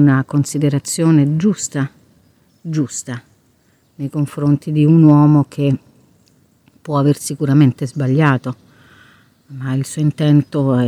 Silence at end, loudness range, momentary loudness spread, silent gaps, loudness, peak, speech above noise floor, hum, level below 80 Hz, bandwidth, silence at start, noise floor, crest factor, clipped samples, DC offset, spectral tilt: 0 s; 5 LU; 17 LU; none; -15 LUFS; 0 dBFS; 42 dB; none; -54 dBFS; 13 kHz; 0 s; -56 dBFS; 16 dB; under 0.1%; under 0.1%; -7 dB/octave